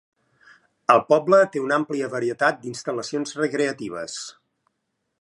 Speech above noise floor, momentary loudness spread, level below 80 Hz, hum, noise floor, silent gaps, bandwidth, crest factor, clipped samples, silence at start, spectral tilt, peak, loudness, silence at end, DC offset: 55 dB; 14 LU; -72 dBFS; none; -77 dBFS; none; 11 kHz; 22 dB; under 0.1%; 0.9 s; -4.5 dB/octave; -2 dBFS; -22 LUFS; 0.9 s; under 0.1%